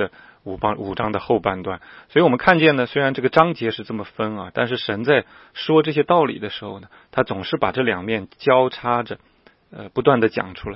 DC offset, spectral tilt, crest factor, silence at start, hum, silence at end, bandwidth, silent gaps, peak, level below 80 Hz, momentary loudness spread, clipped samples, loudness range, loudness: under 0.1%; -8.5 dB/octave; 20 dB; 0 s; none; 0 s; 5.8 kHz; none; 0 dBFS; -52 dBFS; 14 LU; under 0.1%; 3 LU; -20 LUFS